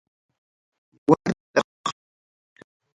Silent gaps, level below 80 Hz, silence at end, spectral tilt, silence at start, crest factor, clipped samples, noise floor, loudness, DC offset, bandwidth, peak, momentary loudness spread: 1.40-1.54 s, 1.64-1.84 s; -64 dBFS; 1.05 s; -5.5 dB/octave; 1.1 s; 26 dB; under 0.1%; under -90 dBFS; -24 LUFS; under 0.1%; 11 kHz; -2 dBFS; 11 LU